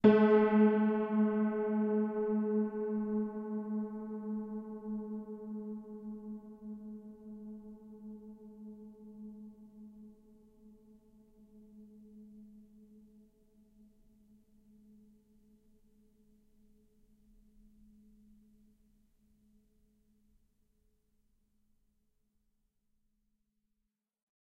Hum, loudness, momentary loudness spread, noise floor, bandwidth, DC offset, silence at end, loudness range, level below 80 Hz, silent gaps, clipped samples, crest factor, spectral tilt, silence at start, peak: none; -33 LUFS; 27 LU; -86 dBFS; 4.4 kHz; under 0.1%; 11.8 s; 27 LU; -72 dBFS; none; under 0.1%; 26 dB; -10 dB/octave; 0.05 s; -12 dBFS